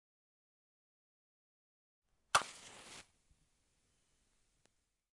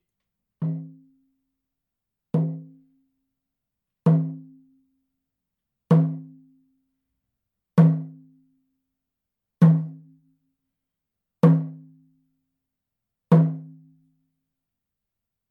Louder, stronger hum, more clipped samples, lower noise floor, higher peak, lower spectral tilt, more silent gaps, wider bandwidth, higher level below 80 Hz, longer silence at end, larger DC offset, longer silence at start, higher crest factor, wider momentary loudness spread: second, -36 LUFS vs -22 LUFS; neither; neither; second, -80 dBFS vs -85 dBFS; second, -14 dBFS vs -4 dBFS; second, 0 dB/octave vs -11 dB/octave; neither; first, 11.5 kHz vs 3.5 kHz; about the same, -78 dBFS vs -76 dBFS; first, 2.15 s vs 1.85 s; neither; first, 2.35 s vs 0.6 s; first, 34 dB vs 22 dB; about the same, 20 LU vs 19 LU